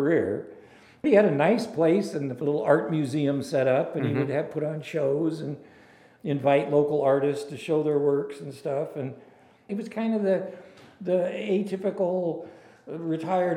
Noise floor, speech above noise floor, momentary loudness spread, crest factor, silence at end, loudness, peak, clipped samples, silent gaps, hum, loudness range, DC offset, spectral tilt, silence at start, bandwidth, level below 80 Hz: -54 dBFS; 29 dB; 14 LU; 20 dB; 0 s; -26 LUFS; -6 dBFS; under 0.1%; none; none; 5 LU; under 0.1%; -7.5 dB/octave; 0 s; 12.5 kHz; -74 dBFS